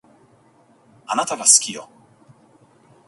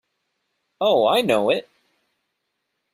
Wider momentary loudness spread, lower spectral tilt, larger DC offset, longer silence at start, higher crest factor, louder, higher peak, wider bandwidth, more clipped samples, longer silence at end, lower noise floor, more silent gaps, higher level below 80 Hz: first, 17 LU vs 7 LU; second, 0.5 dB/octave vs -4.5 dB/octave; neither; first, 1.1 s vs 0.8 s; first, 24 dB vs 18 dB; first, -16 LUFS vs -20 LUFS; first, 0 dBFS vs -6 dBFS; about the same, 16 kHz vs 15.5 kHz; neither; about the same, 1.2 s vs 1.3 s; second, -55 dBFS vs -77 dBFS; neither; second, -74 dBFS vs -66 dBFS